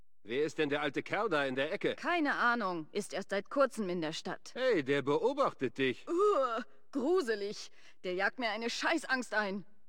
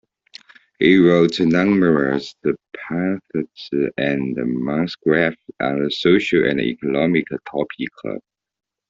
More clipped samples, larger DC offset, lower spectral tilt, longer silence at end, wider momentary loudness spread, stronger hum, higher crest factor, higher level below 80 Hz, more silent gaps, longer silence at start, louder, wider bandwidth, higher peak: neither; first, 0.3% vs under 0.1%; second, -4.5 dB/octave vs -7 dB/octave; second, 0.25 s vs 0.7 s; second, 9 LU vs 12 LU; neither; about the same, 18 dB vs 16 dB; second, -76 dBFS vs -56 dBFS; neither; second, 0.25 s vs 0.8 s; second, -33 LUFS vs -19 LUFS; first, 16.5 kHz vs 7.6 kHz; second, -16 dBFS vs -2 dBFS